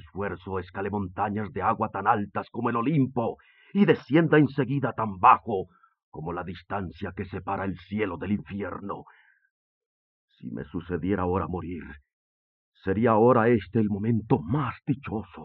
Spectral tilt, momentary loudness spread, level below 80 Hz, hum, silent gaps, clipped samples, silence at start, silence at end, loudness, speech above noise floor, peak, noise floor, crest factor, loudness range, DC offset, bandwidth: -7 dB/octave; 16 LU; -60 dBFS; none; 6.03-6.12 s, 9.51-10.28 s, 12.13-12.72 s; under 0.1%; 0.05 s; 0 s; -26 LUFS; over 64 dB; -6 dBFS; under -90 dBFS; 22 dB; 10 LU; under 0.1%; 5.8 kHz